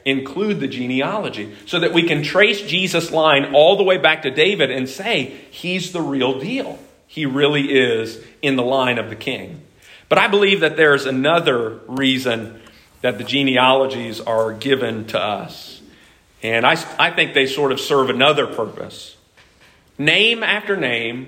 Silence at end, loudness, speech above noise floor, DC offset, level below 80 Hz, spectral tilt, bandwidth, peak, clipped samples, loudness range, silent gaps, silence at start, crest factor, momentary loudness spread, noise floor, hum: 0 s; -17 LUFS; 34 dB; under 0.1%; -60 dBFS; -4.5 dB/octave; 16 kHz; 0 dBFS; under 0.1%; 5 LU; none; 0.05 s; 18 dB; 13 LU; -52 dBFS; none